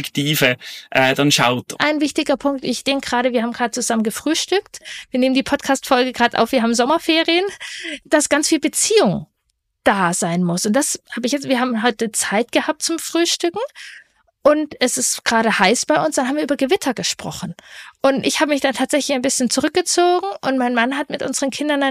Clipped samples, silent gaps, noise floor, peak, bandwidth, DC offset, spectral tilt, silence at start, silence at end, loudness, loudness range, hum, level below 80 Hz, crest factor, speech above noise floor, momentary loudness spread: under 0.1%; none; -71 dBFS; 0 dBFS; 15.5 kHz; under 0.1%; -3 dB/octave; 0 s; 0 s; -18 LUFS; 2 LU; none; -56 dBFS; 18 dB; 53 dB; 8 LU